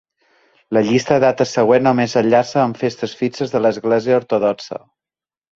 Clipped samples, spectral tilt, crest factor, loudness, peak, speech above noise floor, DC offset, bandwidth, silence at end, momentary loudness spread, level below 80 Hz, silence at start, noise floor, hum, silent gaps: under 0.1%; -6 dB/octave; 18 dB; -16 LUFS; 0 dBFS; over 74 dB; under 0.1%; 7.8 kHz; 0.8 s; 8 LU; -58 dBFS; 0.7 s; under -90 dBFS; none; none